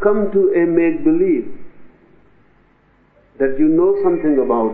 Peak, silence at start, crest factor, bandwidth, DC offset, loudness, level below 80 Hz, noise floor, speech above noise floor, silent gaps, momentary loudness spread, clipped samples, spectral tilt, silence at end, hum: 0 dBFS; 0 s; 16 dB; 3 kHz; under 0.1%; -16 LUFS; -46 dBFS; -54 dBFS; 40 dB; none; 7 LU; under 0.1%; -9 dB/octave; 0 s; none